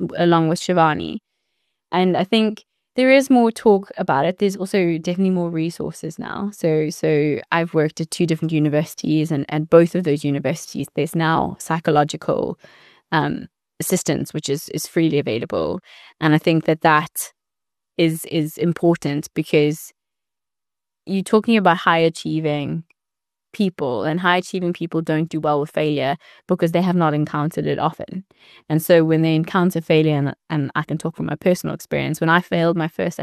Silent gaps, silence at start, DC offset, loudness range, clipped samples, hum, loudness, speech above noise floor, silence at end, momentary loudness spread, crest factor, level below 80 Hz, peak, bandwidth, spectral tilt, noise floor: none; 0 s; under 0.1%; 4 LU; under 0.1%; none; -19 LUFS; 70 dB; 0 s; 10 LU; 18 dB; -58 dBFS; -2 dBFS; 13.5 kHz; -6 dB/octave; -89 dBFS